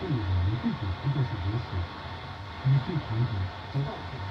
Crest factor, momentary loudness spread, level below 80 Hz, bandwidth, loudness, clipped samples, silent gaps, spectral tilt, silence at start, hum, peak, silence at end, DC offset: 14 dB; 10 LU; -50 dBFS; 6.4 kHz; -31 LUFS; under 0.1%; none; -8.5 dB/octave; 0 s; none; -16 dBFS; 0 s; under 0.1%